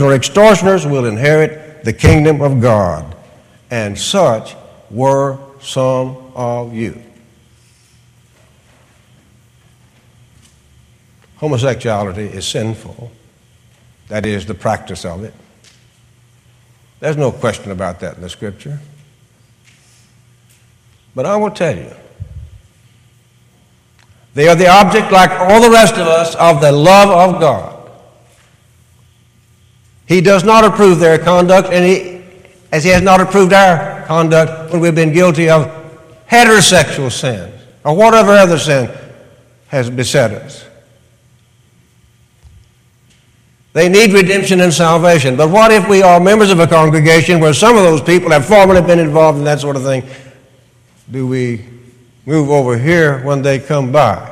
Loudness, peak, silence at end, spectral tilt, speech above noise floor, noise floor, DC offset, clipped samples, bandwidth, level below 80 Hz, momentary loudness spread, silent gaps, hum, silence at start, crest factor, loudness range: -10 LUFS; 0 dBFS; 0 s; -5 dB/octave; 40 dB; -50 dBFS; under 0.1%; under 0.1%; 16 kHz; -38 dBFS; 17 LU; none; none; 0 s; 12 dB; 15 LU